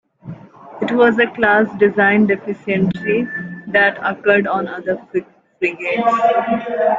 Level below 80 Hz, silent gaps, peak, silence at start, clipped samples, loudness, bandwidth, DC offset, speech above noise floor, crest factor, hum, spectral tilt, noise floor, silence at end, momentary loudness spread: -56 dBFS; none; -2 dBFS; 0.25 s; under 0.1%; -16 LUFS; 7.6 kHz; under 0.1%; 20 dB; 16 dB; none; -7.5 dB/octave; -36 dBFS; 0 s; 12 LU